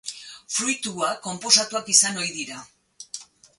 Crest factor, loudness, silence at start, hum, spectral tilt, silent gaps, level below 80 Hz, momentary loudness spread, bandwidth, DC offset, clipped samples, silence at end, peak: 24 dB; -21 LUFS; 0.05 s; none; -0.5 dB/octave; none; -72 dBFS; 20 LU; 12 kHz; under 0.1%; under 0.1%; 0.35 s; -2 dBFS